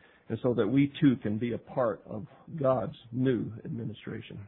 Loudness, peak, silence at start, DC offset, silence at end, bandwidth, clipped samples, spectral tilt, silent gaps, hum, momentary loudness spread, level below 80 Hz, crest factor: -30 LUFS; -12 dBFS; 0.3 s; under 0.1%; 0 s; 4 kHz; under 0.1%; -11.5 dB/octave; none; none; 15 LU; -64 dBFS; 18 dB